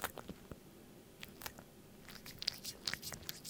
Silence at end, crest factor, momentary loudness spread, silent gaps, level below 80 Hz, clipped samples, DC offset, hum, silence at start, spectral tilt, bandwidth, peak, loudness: 0 s; 34 dB; 17 LU; none; -66 dBFS; under 0.1%; under 0.1%; none; 0 s; -2 dB/octave; 18 kHz; -14 dBFS; -45 LUFS